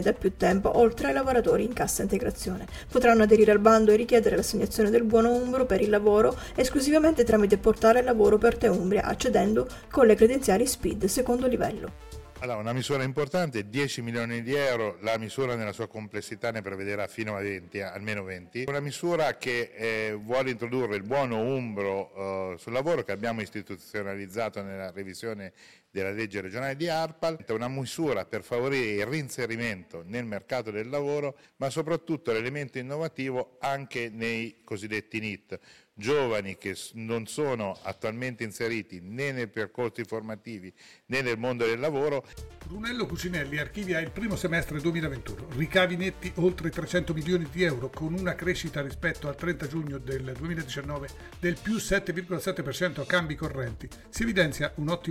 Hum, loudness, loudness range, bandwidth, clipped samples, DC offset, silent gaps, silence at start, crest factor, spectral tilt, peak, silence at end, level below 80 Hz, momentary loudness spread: none; -28 LUFS; 10 LU; 16.5 kHz; under 0.1%; under 0.1%; none; 0 s; 22 dB; -5 dB/octave; -4 dBFS; 0 s; -48 dBFS; 14 LU